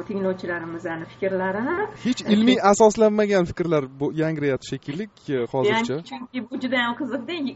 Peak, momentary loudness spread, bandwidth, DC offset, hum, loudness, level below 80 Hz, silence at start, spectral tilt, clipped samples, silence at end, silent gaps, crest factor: -4 dBFS; 14 LU; 8 kHz; under 0.1%; none; -23 LUFS; -56 dBFS; 0 s; -4.5 dB/octave; under 0.1%; 0 s; none; 20 dB